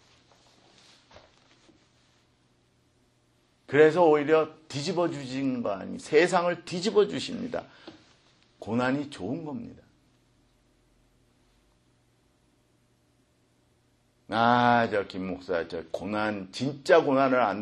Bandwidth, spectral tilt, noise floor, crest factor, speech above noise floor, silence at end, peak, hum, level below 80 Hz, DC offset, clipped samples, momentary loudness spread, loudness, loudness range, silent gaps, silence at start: 11 kHz; -5.5 dB/octave; -67 dBFS; 24 dB; 41 dB; 0 s; -6 dBFS; none; -68 dBFS; under 0.1%; under 0.1%; 14 LU; -26 LUFS; 10 LU; none; 3.7 s